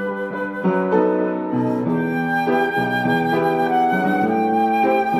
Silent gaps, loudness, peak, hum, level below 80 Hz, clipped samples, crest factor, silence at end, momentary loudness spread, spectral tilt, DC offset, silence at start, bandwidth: none; -19 LUFS; -6 dBFS; none; -58 dBFS; under 0.1%; 14 dB; 0 s; 4 LU; -7.5 dB/octave; under 0.1%; 0 s; 15.5 kHz